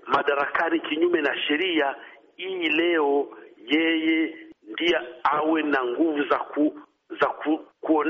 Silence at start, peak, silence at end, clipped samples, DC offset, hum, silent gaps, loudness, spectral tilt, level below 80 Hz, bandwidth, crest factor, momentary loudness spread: 0.05 s; -10 dBFS; 0 s; under 0.1%; under 0.1%; none; none; -24 LUFS; -0.5 dB/octave; -68 dBFS; 6.6 kHz; 16 dB; 10 LU